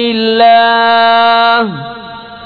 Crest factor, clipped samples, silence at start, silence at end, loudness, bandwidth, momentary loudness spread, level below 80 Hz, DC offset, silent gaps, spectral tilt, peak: 10 dB; under 0.1%; 0 s; 0 s; -8 LUFS; 4.9 kHz; 18 LU; -52 dBFS; under 0.1%; none; -6 dB/octave; 0 dBFS